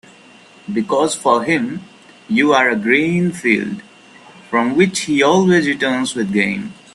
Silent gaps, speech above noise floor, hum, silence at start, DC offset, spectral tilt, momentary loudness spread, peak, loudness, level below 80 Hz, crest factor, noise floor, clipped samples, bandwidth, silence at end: none; 29 dB; none; 0.65 s; under 0.1%; -5 dB/octave; 12 LU; 0 dBFS; -16 LUFS; -58 dBFS; 16 dB; -44 dBFS; under 0.1%; 12.5 kHz; 0.2 s